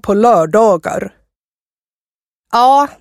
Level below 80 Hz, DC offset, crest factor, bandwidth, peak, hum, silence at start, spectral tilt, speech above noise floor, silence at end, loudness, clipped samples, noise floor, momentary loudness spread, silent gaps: -50 dBFS; under 0.1%; 14 dB; 15 kHz; 0 dBFS; none; 0.05 s; -5.5 dB/octave; over 79 dB; 0.1 s; -11 LUFS; under 0.1%; under -90 dBFS; 12 LU; 1.36-1.87 s, 1.93-2.44 s